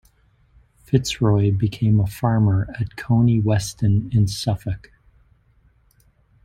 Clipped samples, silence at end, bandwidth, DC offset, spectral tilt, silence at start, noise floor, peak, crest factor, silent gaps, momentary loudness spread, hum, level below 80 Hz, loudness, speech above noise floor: under 0.1%; 1.65 s; 14 kHz; under 0.1%; -7 dB/octave; 0.9 s; -58 dBFS; -4 dBFS; 18 dB; none; 9 LU; none; -44 dBFS; -20 LUFS; 39 dB